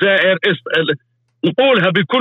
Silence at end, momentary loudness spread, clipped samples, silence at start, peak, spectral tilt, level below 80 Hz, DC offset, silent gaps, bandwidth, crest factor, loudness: 0 s; 8 LU; under 0.1%; 0 s; -4 dBFS; -7 dB/octave; -64 dBFS; under 0.1%; none; 6.4 kHz; 10 dB; -15 LUFS